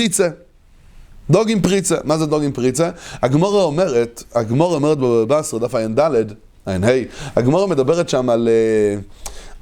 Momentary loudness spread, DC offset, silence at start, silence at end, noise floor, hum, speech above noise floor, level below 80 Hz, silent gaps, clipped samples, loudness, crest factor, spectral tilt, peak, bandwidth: 7 LU; under 0.1%; 0 s; 0.05 s; -46 dBFS; none; 30 dB; -44 dBFS; none; under 0.1%; -17 LUFS; 16 dB; -5.5 dB/octave; 0 dBFS; 18.5 kHz